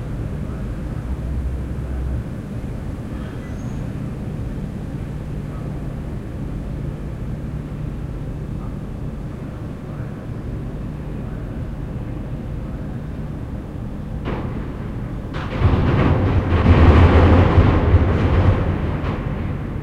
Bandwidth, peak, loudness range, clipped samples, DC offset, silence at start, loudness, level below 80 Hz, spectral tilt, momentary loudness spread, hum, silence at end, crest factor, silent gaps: 6.8 kHz; -2 dBFS; 14 LU; under 0.1%; under 0.1%; 0 s; -22 LUFS; -26 dBFS; -8.5 dB/octave; 14 LU; none; 0 s; 18 dB; none